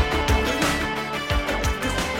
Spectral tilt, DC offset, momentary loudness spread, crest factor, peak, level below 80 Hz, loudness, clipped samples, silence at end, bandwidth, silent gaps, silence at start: -4 dB/octave; under 0.1%; 4 LU; 16 dB; -6 dBFS; -30 dBFS; -23 LUFS; under 0.1%; 0 s; 16.5 kHz; none; 0 s